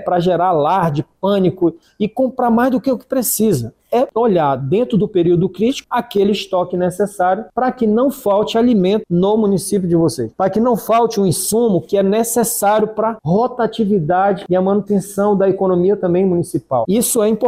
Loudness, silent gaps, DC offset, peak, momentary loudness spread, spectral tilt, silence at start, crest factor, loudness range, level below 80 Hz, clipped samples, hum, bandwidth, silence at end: -16 LUFS; none; under 0.1%; -4 dBFS; 5 LU; -5.5 dB/octave; 0 s; 10 dB; 1 LU; -50 dBFS; under 0.1%; none; 16 kHz; 0 s